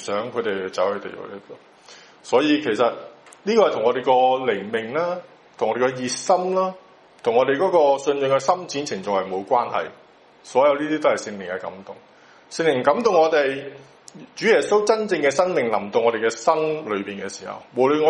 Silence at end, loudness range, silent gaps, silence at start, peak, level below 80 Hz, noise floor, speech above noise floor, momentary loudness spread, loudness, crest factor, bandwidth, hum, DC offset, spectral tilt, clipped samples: 0 s; 3 LU; none; 0 s; -2 dBFS; -70 dBFS; -47 dBFS; 26 dB; 14 LU; -21 LUFS; 18 dB; 11 kHz; none; under 0.1%; -4 dB/octave; under 0.1%